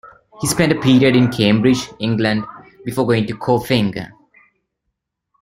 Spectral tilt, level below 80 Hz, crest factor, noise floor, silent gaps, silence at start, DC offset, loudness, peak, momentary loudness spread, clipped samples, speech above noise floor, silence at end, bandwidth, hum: -5.5 dB/octave; -48 dBFS; 16 dB; -76 dBFS; none; 0.05 s; under 0.1%; -16 LUFS; -2 dBFS; 13 LU; under 0.1%; 60 dB; 1.3 s; 16 kHz; none